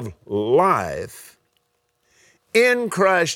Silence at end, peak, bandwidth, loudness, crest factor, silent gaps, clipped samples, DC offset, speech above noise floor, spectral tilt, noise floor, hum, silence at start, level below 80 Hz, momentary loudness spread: 0 s; -4 dBFS; 18.5 kHz; -19 LUFS; 18 dB; none; under 0.1%; under 0.1%; 50 dB; -4 dB/octave; -69 dBFS; none; 0 s; -56 dBFS; 13 LU